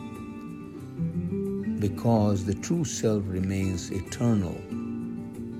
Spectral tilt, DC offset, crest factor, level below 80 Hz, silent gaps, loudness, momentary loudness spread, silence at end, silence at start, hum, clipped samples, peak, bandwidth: -6.5 dB/octave; under 0.1%; 18 dB; -54 dBFS; none; -28 LUFS; 15 LU; 0 s; 0 s; none; under 0.1%; -12 dBFS; 15.5 kHz